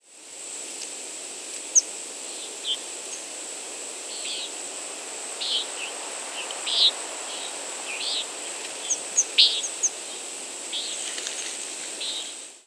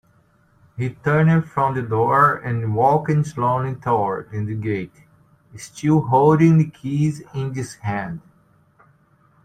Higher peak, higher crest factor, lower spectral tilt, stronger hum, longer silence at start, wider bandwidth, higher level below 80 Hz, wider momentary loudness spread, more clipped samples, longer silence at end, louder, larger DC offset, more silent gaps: about the same, -2 dBFS vs -4 dBFS; first, 28 dB vs 18 dB; second, 3 dB/octave vs -8 dB/octave; neither; second, 0.05 s vs 0.75 s; first, 11 kHz vs 9.6 kHz; second, -90 dBFS vs -54 dBFS; about the same, 14 LU vs 13 LU; neither; second, 0.05 s vs 1.25 s; second, -26 LUFS vs -20 LUFS; neither; neither